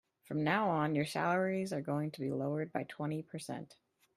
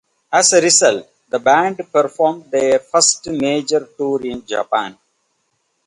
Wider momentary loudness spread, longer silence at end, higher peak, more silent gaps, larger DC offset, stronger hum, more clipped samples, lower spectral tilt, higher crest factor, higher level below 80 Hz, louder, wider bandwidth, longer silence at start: about the same, 12 LU vs 11 LU; second, 0.45 s vs 0.95 s; second, -16 dBFS vs 0 dBFS; neither; neither; neither; neither; first, -6.5 dB/octave vs -2 dB/octave; about the same, 20 dB vs 16 dB; second, -76 dBFS vs -60 dBFS; second, -36 LUFS vs -15 LUFS; first, 14 kHz vs 11.5 kHz; about the same, 0.3 s vs 0.3 s